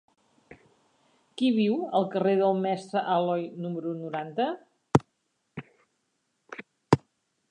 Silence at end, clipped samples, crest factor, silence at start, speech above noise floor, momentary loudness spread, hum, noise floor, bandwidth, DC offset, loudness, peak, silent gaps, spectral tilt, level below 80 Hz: 0.55 s; under 0.1%; 24 dB; 0.5 s; 50 dB; 20 LU; none; -76 dBFS; 10 kHz; under 0.1%; -27 LUFS; -4 dBFS; none; -7 dB/octave; -62 dBFS